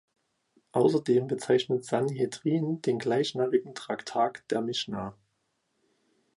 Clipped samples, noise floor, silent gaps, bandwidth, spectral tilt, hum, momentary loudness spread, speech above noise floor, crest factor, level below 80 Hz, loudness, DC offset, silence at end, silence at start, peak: under 0.1%; -77 dBFS; none; 11.5 kHz; -6 dB/octave; none; 8 LU; 49 dB; 18 dB; -70 dBFS; -28 LUFS; under 0.1%; 1.25 s; 0.75 s; -12 dBFS